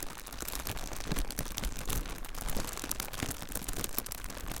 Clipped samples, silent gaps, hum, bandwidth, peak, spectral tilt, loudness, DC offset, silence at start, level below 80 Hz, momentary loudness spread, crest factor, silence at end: under 0.1%; none; none; 17 kHz; -10 dBFS; -3 dB/octave; -38 LUFS; under 0.1%; 0 s; -40 dBFS; 5 LU; 26 dB; 0 s